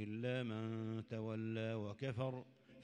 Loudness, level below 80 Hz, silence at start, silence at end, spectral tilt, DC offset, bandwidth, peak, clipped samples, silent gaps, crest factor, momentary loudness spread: -44 LUFS; -78 dBFS; 0 s; 0 s; -8 dB/octave; under 0.1%; 9.2 kHz; -28 dBFS; under 0.1%; none; 16 dB; 3 LU